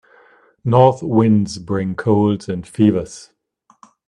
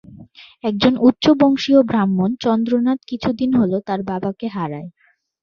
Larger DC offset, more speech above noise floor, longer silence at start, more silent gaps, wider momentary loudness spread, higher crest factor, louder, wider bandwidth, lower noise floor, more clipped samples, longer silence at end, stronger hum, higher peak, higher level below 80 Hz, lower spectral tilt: neither; first, 42 dB vs 26 dB; first, 0.65 s vs 0.1 s; neither; about the same, 14 LU vs 12 LU; about the same, 18 dB vs 18 dB; about the same, -17 LUFS vs -18 LUFS; first, 11 kHz vs 7 kHz; first, -58 dBFS vs -43 dBFS; neither; first, 0.85 s vs 0.55 s; neither; about the same, 0 dBFS vs 0 dBFS; about the same, -52 dBFS vs -52 dBFS; about the same, -8 dB/octave vs -7 dB/octave